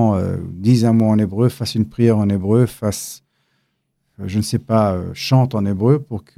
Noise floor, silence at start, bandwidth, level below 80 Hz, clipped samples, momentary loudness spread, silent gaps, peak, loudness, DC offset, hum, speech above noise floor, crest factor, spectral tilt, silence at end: -69 dBFS; 0 s; 15 kHz; -54 dBFS; under 0.1%; 9 LU; none; -2 dBFS; -17 LUFS; under 0.1%; none; 53 dB; 14 dB; -7 dB/octave; 0.2 s